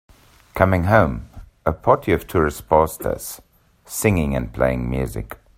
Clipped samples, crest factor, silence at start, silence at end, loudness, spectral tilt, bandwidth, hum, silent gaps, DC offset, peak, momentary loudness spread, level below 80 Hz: under 0.1%; 20 dB; 0.55 s; 0.2 s; -20 LUFS; -6.5 dB/octave; 16 kHz; none; none; under 0.1%; 0 dBFS; 15 LU; -36 dBFS